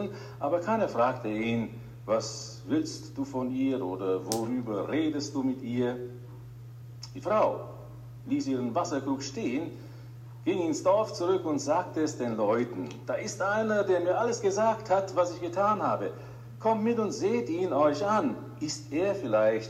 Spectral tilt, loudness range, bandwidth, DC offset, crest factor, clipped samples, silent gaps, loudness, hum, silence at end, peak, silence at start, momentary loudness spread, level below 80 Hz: -5.5 dB/octave; 4 LU; 16 kHz; under 0.1%; 22 dB; under 0.1%; none; -29 LUFS; none; 0 s; -8 dBFS; 0 s; 15 LU; -64 dBFS